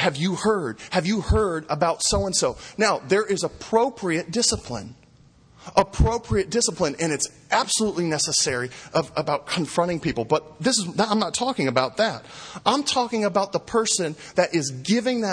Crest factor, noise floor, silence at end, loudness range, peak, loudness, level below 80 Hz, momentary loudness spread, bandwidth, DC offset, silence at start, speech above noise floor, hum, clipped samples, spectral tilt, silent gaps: 20 dB; -54 dBFS; 0 s; 2 LU; -2 dBFS; -23 LUFS; -38 dBFS; 5 LU; 10.5 kHz; under 0.1%; 0 s; 30 dB; none; under 0.1%; -3.5 dB/octave; none